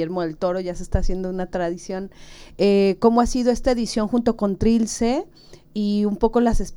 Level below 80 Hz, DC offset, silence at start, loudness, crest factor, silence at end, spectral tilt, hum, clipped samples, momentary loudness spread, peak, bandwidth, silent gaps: -32 dBFS; under 0.1%; 0 s; -21 LUFS; 18 dB; 0 s; -6 dB/octave; none; under 0.1%; 10 LU; -4 dBFS; 12 kHz; none